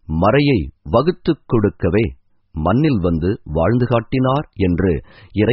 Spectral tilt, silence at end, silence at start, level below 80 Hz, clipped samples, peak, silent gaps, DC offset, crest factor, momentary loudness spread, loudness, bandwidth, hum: -7 dB/octave; 0 s; 0.1 s; -34 dBFS; under 0.1%; -2 dBFS; none; under 0.1%; 16 dB; 6 LU; -18 LUFS; 5.8 kHz; none